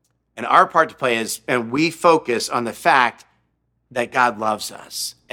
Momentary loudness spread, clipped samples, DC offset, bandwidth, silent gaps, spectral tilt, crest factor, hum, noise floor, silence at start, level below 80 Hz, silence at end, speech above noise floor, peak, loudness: 12 LU; under 0.1%; under 0.1%; 18 kHz; none; -3.5 dB/octave; 20 dB; none; -68 dBFS; 0.35 s; -64 dBFS; 0.2 s; 49 dB; 0 dBFS; -19 LUFS